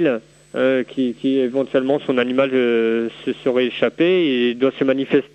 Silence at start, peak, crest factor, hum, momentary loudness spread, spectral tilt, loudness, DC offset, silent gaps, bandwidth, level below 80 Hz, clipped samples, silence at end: 0 s; -2 dBFS; 16 dB; none; 6 LU; -7 dB/octave; -19 LUFS; under 0.1%; none; 8.4 kHz; -64 dBFS; under 0.1%; 0.1 s